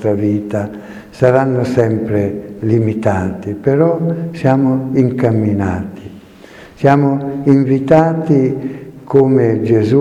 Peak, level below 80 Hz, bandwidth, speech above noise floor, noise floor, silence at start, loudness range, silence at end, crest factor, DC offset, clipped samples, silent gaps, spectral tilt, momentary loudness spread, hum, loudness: 0 dBFS; -48 dBFS; 9.4 kHz; 25 dB; -38 dBFS; 0 s; 3 LU; 0 s; 14 dB; under 0.1%; 0.1%; none; -9 dB/octave; 10 LU; none; -14 LUFS